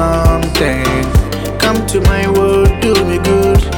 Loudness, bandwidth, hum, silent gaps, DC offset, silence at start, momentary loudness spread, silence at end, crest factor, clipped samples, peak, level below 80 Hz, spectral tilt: -12 LUFS; 19 kHz; none; none; under 0.1%; 0 s; 4 LU; 0 s; 10 dB; under 0.1%; 0 dBFS; -18 dBFS; -5.5 dB/octave